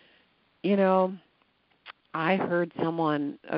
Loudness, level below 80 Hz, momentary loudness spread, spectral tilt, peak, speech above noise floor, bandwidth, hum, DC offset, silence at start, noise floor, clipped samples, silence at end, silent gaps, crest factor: -27 LUFS; -76 dBFS; 10 LU; -5.5 dB/octave; -10 dBFS; 42 dB; 5.4 kHz; none; under 0.1%; 0.65 s; -68 dBFS; under 0.1%; 0 s; none; 20 dB